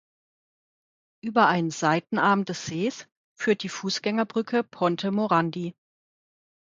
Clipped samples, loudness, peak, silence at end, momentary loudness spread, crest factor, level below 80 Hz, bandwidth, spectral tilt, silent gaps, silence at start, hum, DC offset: under 0.1%; -25 LUFS; -6 dBFS; 0.9 s; 9 LU; 20 dB; -70 dBFS; 7.6 kHz; -5 dB/octave; 3.17-3.36 s; 1.25 s; none; under 0.1%